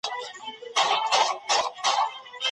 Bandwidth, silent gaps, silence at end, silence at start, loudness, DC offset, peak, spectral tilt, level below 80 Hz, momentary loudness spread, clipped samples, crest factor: 11.5 kHz; none; 0 s; 0.05 s; -25 LUFS; under 0.1%; -8 dBFS; 1.5 dB/octave; -78 dBFS; 12 LU; under 0.1%; 18 dB